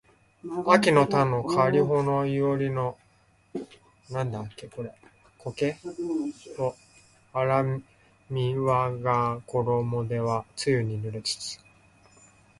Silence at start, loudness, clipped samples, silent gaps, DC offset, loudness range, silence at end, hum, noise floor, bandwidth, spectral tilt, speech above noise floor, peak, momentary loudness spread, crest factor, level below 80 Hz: 0.45 s; -26 LUFS; under 0.1%; none; under 0.1%; 10 LU; 1.05 s; none; -62 dBFS; 11.5 kHz; -6 dB/octave; 37 dB; -4 dBFS; 17 LU; 22 dB; -60 dBFS